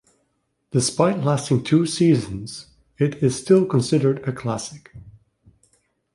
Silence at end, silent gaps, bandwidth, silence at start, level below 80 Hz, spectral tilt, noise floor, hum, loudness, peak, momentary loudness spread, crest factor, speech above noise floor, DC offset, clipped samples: 1.05 s; none; 11.5 kHz; 0.75 s; -54 dBFS; -6 dB/octave; -71 dBFS; none; -20 LUFS; -2 dBFS; 14 LU; 20 dB; 51 dB; under 0.1%; under 0.1%